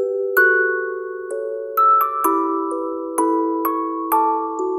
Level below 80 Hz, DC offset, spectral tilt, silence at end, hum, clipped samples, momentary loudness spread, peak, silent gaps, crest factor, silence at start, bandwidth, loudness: -70 dBFS; under 0.1%; -3 dB/octave; 0 s; none; under 0.1%; 12 LU; -4 dBFS; none; 16 dB; 0 s; 16 kHz; -19 LUFS